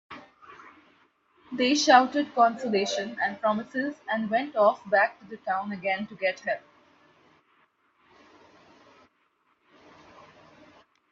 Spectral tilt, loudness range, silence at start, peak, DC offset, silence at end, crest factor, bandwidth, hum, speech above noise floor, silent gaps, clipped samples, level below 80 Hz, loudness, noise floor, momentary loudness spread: -3.5 dB/octave; 11 LU; 0.1 s; -4 dBFS; under 0.1%; 4.55 s; 26 dB; 7.8 kHz; none; 45 dB; none; under 0.1%; -76 dBFS; -25 LUFS; -70 dBFS; 13 LU